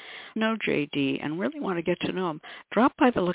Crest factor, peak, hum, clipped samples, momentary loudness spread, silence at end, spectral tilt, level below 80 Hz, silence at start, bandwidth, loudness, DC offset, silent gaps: 20 dB; -6 dBFS; none; under 0.1%; 9 LU; 0 s; -4 dB/octave; -60 dBFS; 0 s; 4 kHz; -27 LUFS; under 0.1%; none